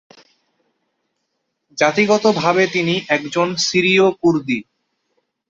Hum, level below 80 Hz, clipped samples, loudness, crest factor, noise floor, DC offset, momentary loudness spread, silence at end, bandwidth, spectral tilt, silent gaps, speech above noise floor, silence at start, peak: none; -60 dBFS; under 0.1%; -16 LUFS; 18 dB; -73 dBFS; under 0.1%; 7 LU; 0.9 s; 7.8 kHz; -4.5 dB/octave; none; 57 dB; 1.75 s; -2 dBFS